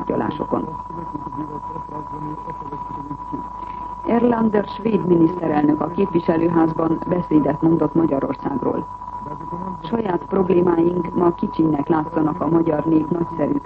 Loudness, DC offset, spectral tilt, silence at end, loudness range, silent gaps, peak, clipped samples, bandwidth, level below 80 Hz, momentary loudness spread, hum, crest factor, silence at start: -21 LUFS; under 0.1%; -10 dB/octave; 0 s; 9 LU; none; -4 dBFS; under 0.1%; 4.9 kHz; -46 dBFS; 13 LU; none; 16 dB; 0 s